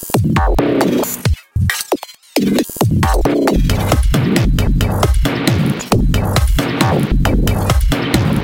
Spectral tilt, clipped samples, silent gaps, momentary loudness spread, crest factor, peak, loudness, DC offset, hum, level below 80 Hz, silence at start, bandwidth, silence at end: -5.5 dB/octave; under 0.1%; none; 3 LU; 14 dB; 0 dBFS; -15 LUFS; under 0.1%; none; -18 dBFS; 0 s; 17.5 kHz; 0 s